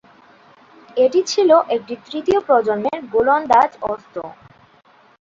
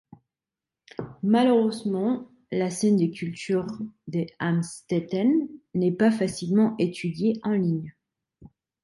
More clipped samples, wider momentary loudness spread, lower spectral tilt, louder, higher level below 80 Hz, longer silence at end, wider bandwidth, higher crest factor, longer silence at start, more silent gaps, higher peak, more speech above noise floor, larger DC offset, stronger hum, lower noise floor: neither; first, 14 LU vs 10 LU; second, -4 dB/octave vs -6.5 dB/octave; first, -17 LUFS vs -25 LUFS; first, -56 dBFS vs -66 dBFS; first, 0.9 s vs 0.4 s; second, 7.6 kHz vs 11.5 kHz; about the same, 16 dB vs 16 dB; about the same, 0.95 s vs 1 s; neither; first, -2 dBFS vs -10 dBFS; second, 35 dB vs 66 dB; neither; neither; second, -52 dBFS vs -90 dBFS